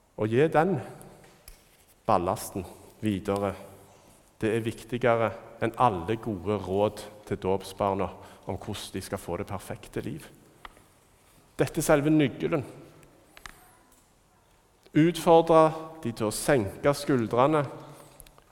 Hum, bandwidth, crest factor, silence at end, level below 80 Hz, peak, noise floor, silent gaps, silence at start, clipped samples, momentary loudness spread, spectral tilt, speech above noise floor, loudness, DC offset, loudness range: none; 18 kHz; 22 dB; 0.55 s; -56 dBFS; -6 dBFS; -62 dBFS; none; 0.2 s; under 0.1%; 17 LU; -6 dB/octave; 36 dB; -27 LUFS; under 0.1%; 9 LU